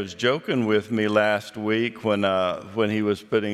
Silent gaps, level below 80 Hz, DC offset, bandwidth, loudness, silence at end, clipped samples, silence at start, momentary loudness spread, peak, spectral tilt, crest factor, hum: none; -70 dBFS; under 0.1%; 13.5 kHz; -23 LUFS; 0 s; under 0.1%; 0 s; 5 LU; -6 dBFS; -6 dB/octave; 18 dB; none